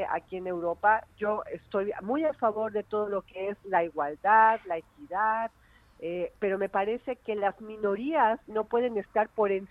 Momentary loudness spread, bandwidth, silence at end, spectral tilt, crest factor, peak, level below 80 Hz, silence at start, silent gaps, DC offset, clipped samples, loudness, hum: 10 LU; 4.7 kHz; 0.05 s; -7.5 dB/octave; 18 dB; -10 dBFS; -64 dBFS; 0 s; none; under 0.1%; under 0.1%; -29 LUFS; none